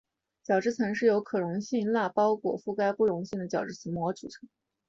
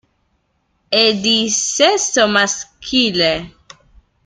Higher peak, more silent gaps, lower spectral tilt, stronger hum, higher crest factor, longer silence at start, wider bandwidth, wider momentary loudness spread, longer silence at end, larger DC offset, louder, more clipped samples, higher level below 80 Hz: second, -12 dBFS vs 0 dBFS; neither; first, -6.5 dB/octave vs -1.5 dB/octave; neither; about the same, 16 dB vs 18 dB; second, 0.5 s vs 0.9 s; second, 7.6 kHz vs 12 kHz; about the same, 8 LU vs 6 LU; second, 0.5 s vs 0.75 s; neither; second, -29 LUFS vs -14 LUFS; neither; second, -70 dBFS vs -50 dBFS